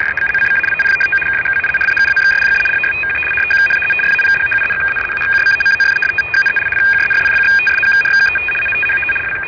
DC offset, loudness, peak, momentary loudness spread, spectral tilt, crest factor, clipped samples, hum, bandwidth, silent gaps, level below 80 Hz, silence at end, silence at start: under 0.1%; -11 LUFS; -8 dBFS; 4 LU; -2.5 dB/octave; 6 dB; under 0.1%; none; 5.4 kHz; none; -44 dBFS; 0 s; 0 s